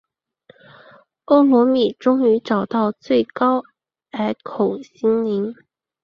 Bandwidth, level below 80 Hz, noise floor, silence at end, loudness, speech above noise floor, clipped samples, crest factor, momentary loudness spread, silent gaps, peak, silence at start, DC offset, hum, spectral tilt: 6.8 kHz; -64 dBFS; -54 dBFS; 0.5 s; -19 LUFS; 36 dB; under 0.1%; 18 dB; 10 LU; none; -2 dBFS; 1.3 s; under 0.1%; none; -7.5 dB/octave